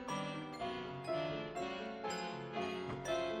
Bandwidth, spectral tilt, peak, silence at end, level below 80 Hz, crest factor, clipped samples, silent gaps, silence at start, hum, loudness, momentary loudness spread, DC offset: 14 kHz; -5 dB/octave; -26 dBFS; 0 s; -68 dBFS; 16 dB; under 0.1%; none; 0 s; none; -42 LUFS; 4 LU; under 0.1%